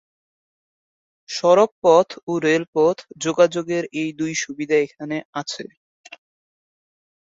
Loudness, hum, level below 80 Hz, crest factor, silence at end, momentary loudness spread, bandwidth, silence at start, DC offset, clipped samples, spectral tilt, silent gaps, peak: -20 LUFS; none; -68 dBFS; 20 dB; 1.7 s; 13 LU; 7.8 kHz; 1.3 s; under 0.1%; under 0.1%; -4.5 dB/octave; 1.71-1.82 s, 2.23-2.27 s, 2.68-2.73 s, 5.25-5.33 s; -2 dBFS